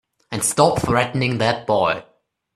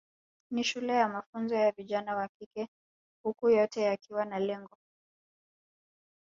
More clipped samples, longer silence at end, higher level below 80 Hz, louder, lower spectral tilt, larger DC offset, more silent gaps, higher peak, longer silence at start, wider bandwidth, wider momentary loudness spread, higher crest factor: neither; second, 0.55 s vs 1.65 s; first, -46 dBFS vs -78 dBFS; first, -19 LUFS vs -31 LUFS; about the same, -4 dB/octave vs -4.5 dB/octave; neither; second, none vs 1.26-1.33 s, 2.29-2.40 s, 2.46-2.51 s, 2.68-3.24 s; first, 0 dBFS vs -12 dBFS; second, 0.3 s vs 0.5 s; first, 14.5 kHz vs 7.6 kHz; second, 6 LU vs 14 LU; about the same, 20 dB vs 20 dB